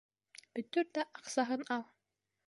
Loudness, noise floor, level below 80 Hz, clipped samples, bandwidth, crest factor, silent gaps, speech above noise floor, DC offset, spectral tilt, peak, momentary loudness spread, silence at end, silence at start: -38 LUFS; -87 dBFS; -90 dBFS; under 0.1%; 11.5 kHz; 20 dB; none; 50 dB; under 0.1%; -3 dB/octave; -20 dBFS; 21 LU; 0.65 s; 0.55 s